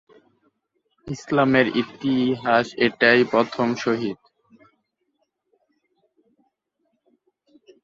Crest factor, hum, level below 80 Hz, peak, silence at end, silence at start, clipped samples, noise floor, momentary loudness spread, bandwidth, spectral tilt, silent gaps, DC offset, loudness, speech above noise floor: 22 dB; none; -64 dBFS; -2 dBFS; 3.7 s; 1.05 s; under 0.1%; -73 dBFS; 13 LU; 7.6 kHz; -6 dB/octave; none; under 0.1%; -20 LUFS; 53 dB